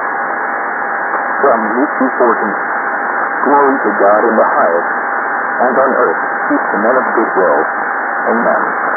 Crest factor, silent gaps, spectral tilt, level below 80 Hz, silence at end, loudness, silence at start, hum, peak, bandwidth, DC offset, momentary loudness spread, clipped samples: 12 dB; none; -13 dB/octave; -64 dBFS; 0 s; -13 LUFS; 0 s; none; 0 dBFS; 2.4 kHz; under 0.1%; 6 LU; under 0.1%